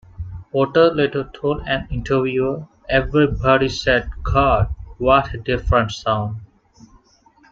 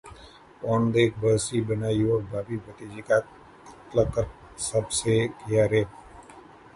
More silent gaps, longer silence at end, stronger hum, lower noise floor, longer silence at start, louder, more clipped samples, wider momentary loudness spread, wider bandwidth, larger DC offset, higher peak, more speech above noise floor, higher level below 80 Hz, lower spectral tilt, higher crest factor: neither; first, 1.05 s vs 0.35 s; neither; first, -54 dBFS vs -49 dBFS; first, 0.2 s vs 0.05 s; first, -19 LUFS vs -26 LUFS; neither; second, 9 LU vs 13 LU; second, 7.8 kHz vs 11.5 kHz; neither; first, -2 dBFS vs -8 dBFS; first, 36 dB vs 24 dB; first, -32 dBFS vs -48 dBFS; about the same, -6.5 dB/octave vs -5.5 dB/octave; about the same, 18 dB vs 18 dB